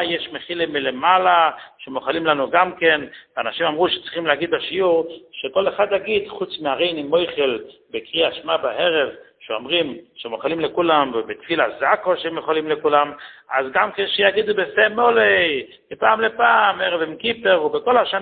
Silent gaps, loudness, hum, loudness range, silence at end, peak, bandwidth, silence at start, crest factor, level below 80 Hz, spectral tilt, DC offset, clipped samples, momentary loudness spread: none; -19 LUFS; none; 4 LU; 0 s; 0 dBFS; 4.7 kHz; 0 s; 18 dB; -60 dBFS; -8.5 dB/octave; under 0.1%; under 0.1%; 12 LU